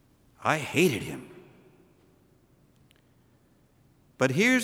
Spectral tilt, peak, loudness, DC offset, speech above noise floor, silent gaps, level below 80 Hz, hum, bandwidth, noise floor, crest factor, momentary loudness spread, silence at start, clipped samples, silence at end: -4.5 dB/octave; -8 dBFS; -26 LUFS; under 0.1%; 38 dB; none; -66 dBFS; none; 17 kHz; -63 dBFS; 24 dB; 18 LU; 0.4 s; under 0.1%; 0 s